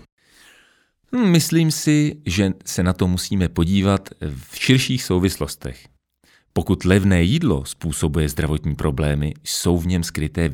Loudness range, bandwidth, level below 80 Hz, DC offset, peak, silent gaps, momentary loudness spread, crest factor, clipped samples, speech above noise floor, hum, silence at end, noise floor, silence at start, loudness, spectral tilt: 2 LU; 18.5 kHz; -34 dBFS; under 0.1%; 0 dBFS; none; 10 LU; 20 dB; under 0.1%; 40 dB; none; 0 s; -59 dBFS; 1.1 s; -20 LUFS; -5.5 dB/octave